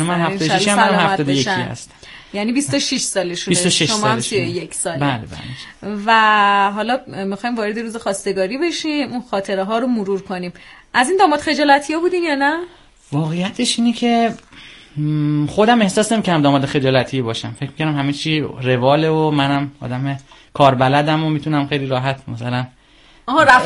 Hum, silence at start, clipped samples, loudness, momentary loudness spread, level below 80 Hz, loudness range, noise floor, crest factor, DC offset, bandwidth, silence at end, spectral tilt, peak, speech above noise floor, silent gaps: none; 0 s; under 0.1%; -17 LUFS; 12 LU; -50 dBFS; 3 LU; -48 dBFS; 18 dB; under 0.1%; 11.5 kHz; 0 s; -4.5 dB/octave; 0 dBFS; 31 dB; none